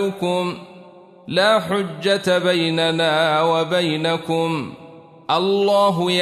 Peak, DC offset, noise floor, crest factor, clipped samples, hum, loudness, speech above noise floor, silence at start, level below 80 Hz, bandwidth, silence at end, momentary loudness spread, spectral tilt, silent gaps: -4 dBFS; under 0.1%; -44 dBFS; 16 dB; under 0.1%; none; -19 LUFS; 25 dB; 0 s; -64 dBFS; 13.5 kHz; 0 s; 7 LU; -5 dB/octave; none